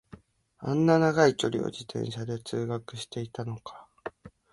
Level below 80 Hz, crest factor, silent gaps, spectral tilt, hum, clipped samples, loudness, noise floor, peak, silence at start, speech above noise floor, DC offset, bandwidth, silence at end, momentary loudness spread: -64 dBFS; 22 dB; none; -6 dB/octave; none; under 0.1%; -28 LUFS; -54 dBFS; -8 dBFS; 0.6 s; 27 dB; under 0.1%; 11.5 kHz; 0.25 s; 20 LU